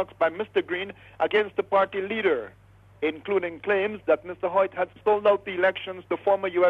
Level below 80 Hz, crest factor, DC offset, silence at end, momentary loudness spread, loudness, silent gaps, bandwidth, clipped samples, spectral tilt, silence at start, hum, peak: -64 dBFS; 16 dB; under 0.1%; 0 s; 7 LU; -26 LUFS; none; 5.2 kHz; under 0.1%; -6.5 dB/octave; 0 s; none; -10 dBFS